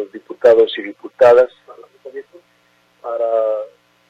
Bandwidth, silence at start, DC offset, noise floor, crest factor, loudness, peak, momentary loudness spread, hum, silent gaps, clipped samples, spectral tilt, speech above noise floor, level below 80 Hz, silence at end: 7.8 kHz; 0 s; under 0.1%; -57 dBFS; 16 dB; -15 LUFS; -2 dBFS; 23 LU; none; none; under 0.1%; -5 dB/octave; 44 dB; -62 dBFS; 0.45 s